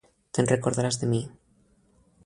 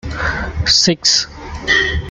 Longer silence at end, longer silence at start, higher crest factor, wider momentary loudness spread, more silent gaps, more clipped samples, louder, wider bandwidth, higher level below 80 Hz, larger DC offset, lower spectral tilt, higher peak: first, 0.95 s vs 0 s; first, 0.35 s vs 0.05 s; first, 22 dB vs 16 dB; second, 8 LU vs 11 LU; neither; neither; second, -26 LUFS vs -13 LUFS; about the same, 11.5 kHz vs 12 kHz; second, -60 dBFS vs -30 dBFS; neither; first, -5.5 dB/octave vs -2 dB/octave; second, -8 dBFS vs 0 dBFS